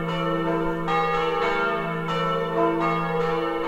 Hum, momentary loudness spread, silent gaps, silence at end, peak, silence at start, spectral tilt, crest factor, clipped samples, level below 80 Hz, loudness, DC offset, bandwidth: none; 3 LU; none; 0 s; -8 dBFS; 0 s; -6.5 dB/octave; 16 dB; under 0.1%; -46 dBFS; -24 LUFS; under 0.1%; 15.5 kHz